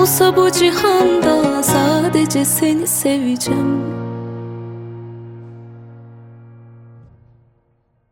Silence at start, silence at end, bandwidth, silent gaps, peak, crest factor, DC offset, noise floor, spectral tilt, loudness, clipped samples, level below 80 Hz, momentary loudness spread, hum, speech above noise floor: 0 s; 1.35 s; 16.5 kHz; none; -2 dBFS; 16 dB; under 0.1%; -61 dBFS; -4 dB/octave; -15 LUFS; under 0.1%; -52 dBFS; 21 LU; none; 47 dB